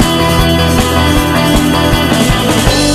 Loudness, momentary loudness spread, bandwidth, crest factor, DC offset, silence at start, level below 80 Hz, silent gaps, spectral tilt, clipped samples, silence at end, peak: -10 LUFS; 0 LU; 14.5 kHz; 10 dB; under 0.1%; 0 s; -20 dBFS; none; -4.5 dB/octave; 0.2%; 0 s; 0 dBFS